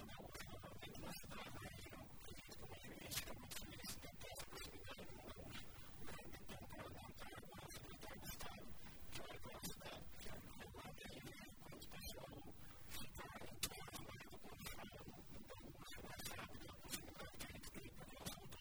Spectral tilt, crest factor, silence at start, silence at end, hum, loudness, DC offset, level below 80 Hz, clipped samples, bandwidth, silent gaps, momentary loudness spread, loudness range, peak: -3 dB/octave; 26 dB; 0 s; 0 s; none; -54 LUFS; under 0.1%; -64 dBFS; under 0.1%; over 20 kHz; none; 7 LU; 3 LU; -26 dBFS